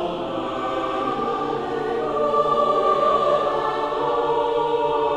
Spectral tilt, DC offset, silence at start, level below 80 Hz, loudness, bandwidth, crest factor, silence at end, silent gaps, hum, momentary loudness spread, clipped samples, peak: -6 dB/octave; under 0.1%; 0 s; -50 dBFS; -22 LUFS; 9.8 kHz; 16 dB; 0 s; none; none; 7 LU; under 0.1%; -6 dBFS